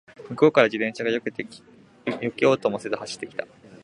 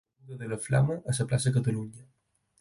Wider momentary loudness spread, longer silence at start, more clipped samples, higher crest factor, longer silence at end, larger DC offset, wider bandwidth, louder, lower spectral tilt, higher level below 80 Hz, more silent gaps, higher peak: about the same, 17 LU vs 15 LU; about the same, 0.2 s vs 0.25 s; neither; first, 24 dB vs 18 dB; second, 0.1 s vs 0.55 s; neither; about the same, 11 kHz vs 11.5 kHz; first, -24 LUFS vs -29 LUFS; about the same, -5.5 dB/octave vs -6 dB/octave; second, -68 dBFS vs -58 dBFS; neither; first, -2 dBFS vs -12 dBFS